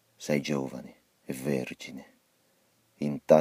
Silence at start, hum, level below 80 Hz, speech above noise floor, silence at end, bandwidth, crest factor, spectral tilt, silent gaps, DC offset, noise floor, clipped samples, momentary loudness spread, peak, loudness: 0.2 s; none; -66 dBFS; 41 dB; 0 s; 15.5 kHz; 24 dB; -6 dB/octave; none; under 0.1%; -69 dBFS; under 0.1%; 18 LU; -6 dBFS; -32 LUFS